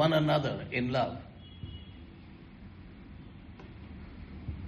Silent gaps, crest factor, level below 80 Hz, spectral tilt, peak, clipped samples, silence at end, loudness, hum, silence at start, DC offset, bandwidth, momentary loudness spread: none; 22 dB; -52 dBFS; -7.5 dB/octave; -14 dBFS; under 0.1%; 0 s; -32 LUFS; none; 0 s; under 0.1%; 11.5 kHz; 22 LU